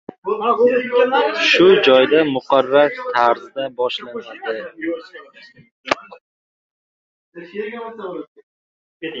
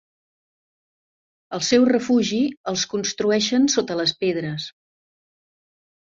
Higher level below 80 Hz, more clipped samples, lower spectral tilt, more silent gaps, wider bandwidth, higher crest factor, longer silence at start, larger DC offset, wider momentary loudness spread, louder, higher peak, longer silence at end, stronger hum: about the same, -64 dBFS vs -64 dBFS; neither; about the same, -4.5 dB/octave vs -3.5 dB/octave; first, 5.71-5.84 s, 6.21-7.32 s, 8.28-8.35 s, 8.43-9.00 s vs 2.57-2.64 s; about the same, 7.6 kHz vs 7.8 kHz; about the same, 18 dB vs 18 dB; second, 0.25 s vs 1.5 s; neither; first, 19 LU vs 11 LU; first, -16 LUFS vs -21 LUFS; first, -2 dBFS vs -6 dBFS; second, 0 s vs 1.45 s; neither